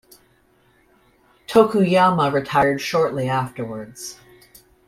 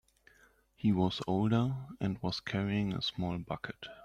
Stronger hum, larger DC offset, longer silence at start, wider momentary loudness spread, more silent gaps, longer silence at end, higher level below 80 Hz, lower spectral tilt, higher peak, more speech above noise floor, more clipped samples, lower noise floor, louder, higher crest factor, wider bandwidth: neither; neither; first, 1.5 s vs 0.85 s; first, 16 LU vs 9 LU; neither; first, 0.75 s vs 0 s; about the same, -56 dBFS vs -60 dBFS; about the same, -6 dB/octave vs -7 dB/octave; first, -2 dBFS vs -18 dBFS; first, 40 dB vs 33 dB; neither; second, -59 dBFS vs -66 dBFS; first, -19 LUFS vs -34 LUFS; about the same, 20 dB vs 16 dB; first, 16 kHz vs 10.5 kHz